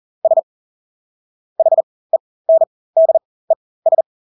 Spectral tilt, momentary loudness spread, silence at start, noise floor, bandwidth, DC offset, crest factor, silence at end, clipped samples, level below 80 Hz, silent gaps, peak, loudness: -9.5 dB/octave; 7 LU; 0.25 s; under -90 dBFS; 1.1 kHz; under 0.1%; 12 dB; 0.35 s; under 0.1%; -80 dBFS; 0.43-1.56 s, 1.83-2.10 s, 2.20-2.45 s, 2.67-2.93 s, 3.25-3.48 s, 3.56-3.82 s; -4 dBFS; -16 LUFS